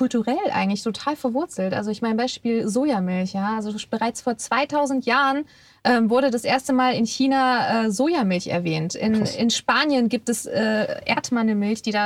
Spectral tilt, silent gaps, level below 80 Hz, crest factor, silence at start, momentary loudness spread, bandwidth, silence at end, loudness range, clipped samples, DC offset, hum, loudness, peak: -4.5 dB/octave; none; -64 dBFS; 16 dB; 0 s; 6 LU; 14.5 kHz; 0 s; 3 LU; under 0.1%; under 0.1%; none; -22 LUFS; -6 dBFS